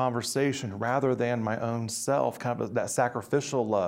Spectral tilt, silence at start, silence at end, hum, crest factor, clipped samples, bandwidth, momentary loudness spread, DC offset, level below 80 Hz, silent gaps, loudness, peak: -5 dB/octave; 0 s; 0 s; none; 16 dB; under 0.1%; 16 kHz; 4 LU; under 0.1%; -66 dBFS; none; -29 LUFS; -12 dBFS